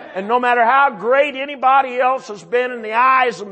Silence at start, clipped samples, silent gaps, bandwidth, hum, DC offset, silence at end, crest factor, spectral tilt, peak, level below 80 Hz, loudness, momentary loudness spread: 0 s; under 0.1%; none; 8.6 kHz; none; under 0.1%; 0 s; 14 dB; -4 dB/octave; -2 dBFS; -70 dBFS; -16 LUFS; 7 LU